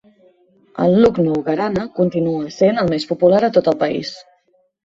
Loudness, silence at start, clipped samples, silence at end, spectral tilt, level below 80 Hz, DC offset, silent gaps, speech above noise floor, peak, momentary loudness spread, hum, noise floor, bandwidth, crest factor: -17 LUFS; 0.75 s; under 0.1%; 0.65 s; -7.5 dB/octave; -50 dBFS; under 0.1%; none; 44 dB; -2 dBFS; 8 LU; none; -60 dBFS; 7.8 kHz; 16 dB